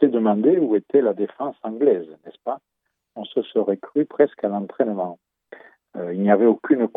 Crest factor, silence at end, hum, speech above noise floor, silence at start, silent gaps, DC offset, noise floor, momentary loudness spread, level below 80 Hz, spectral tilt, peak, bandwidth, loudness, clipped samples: 20 dB; 0.1 s; none; 26 dB; 0 s; none; under 0.1%; -46 dBFS; 15 LU; -82 dBFS; -11 dB/octave; -2 dBFS; 3.9 kHz; -21 LUFS; under 0.1%